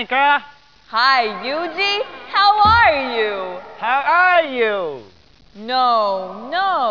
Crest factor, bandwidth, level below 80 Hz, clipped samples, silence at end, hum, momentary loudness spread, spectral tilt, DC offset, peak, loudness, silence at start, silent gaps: 16 dB; 5.4 kHz; -46 dBFS; under 0.1%; 0 s; none; 13 LU; -4.5 dB/octave; 0.4%; -2 dBFS; -16 LUFS; 0 s; none